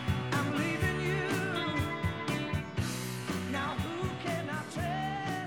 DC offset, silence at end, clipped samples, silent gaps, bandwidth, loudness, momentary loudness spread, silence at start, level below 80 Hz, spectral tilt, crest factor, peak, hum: under 0.1%; 0 s; under 0.1%; none; 19.5 kHz; -33 LUFS; 5 LU; 0 s; -50 dBFS; -5.5 dB/octave; 16 dB; -18 dBFS; none